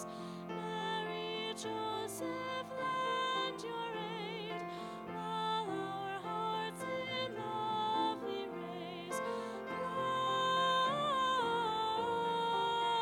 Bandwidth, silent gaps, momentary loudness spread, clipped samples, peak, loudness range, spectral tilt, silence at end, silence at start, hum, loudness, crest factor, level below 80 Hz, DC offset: 18 kHz; none; 9 LU; under 0.1%; -24 dBFS; 5 LU; -4 dB/octave; 0 s; 0 s; none; -37 LUFS; 14 dB; -72 dBFS; under 0.1%